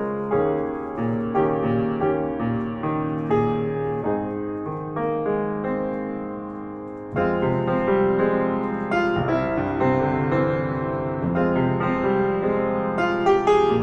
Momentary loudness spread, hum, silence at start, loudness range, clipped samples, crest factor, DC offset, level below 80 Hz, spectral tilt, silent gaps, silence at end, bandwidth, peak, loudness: 8 LU; none; 0 s; 4 LU; under 0.1%; 16 dB; under 0.1%; -48 dBFS; -8.5 dB/octave; none; 0 s; 7.6 kHz; -8 dBFS; -23 LUFS